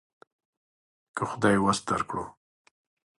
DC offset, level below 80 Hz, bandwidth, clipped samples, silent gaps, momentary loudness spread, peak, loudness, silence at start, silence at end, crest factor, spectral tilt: under 0.1%; -58 dBFS; 11.5 kHz; under 0.1%; none; 15 LU; -10 dBFS; -27 LUFS; 1.15 s; 0.9 s; 22 dB; -5 dB/octave